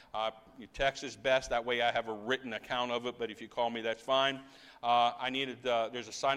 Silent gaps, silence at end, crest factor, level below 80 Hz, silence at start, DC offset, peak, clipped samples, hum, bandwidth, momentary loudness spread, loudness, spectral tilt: none; 0 s; 18 dB; -60 dBFS; 0.15 s; under 0.1%; -16 dBFS; under 0.1%; none; 12.5 kHz; 9 LU; -33 LUFS; -3 dB/octave